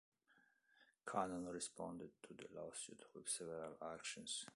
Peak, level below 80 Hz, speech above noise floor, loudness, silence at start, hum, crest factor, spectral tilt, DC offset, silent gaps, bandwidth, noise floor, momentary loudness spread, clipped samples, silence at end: -26 dBFS; -82 dBFS; 28 dB; -49 LUFS; 0.3 s; none; 26 dB; -2.5 dB/octave; under 0.1%; none; 11.5 kHz; -78 dBFS; 11 LU; under 0.1%; 0 s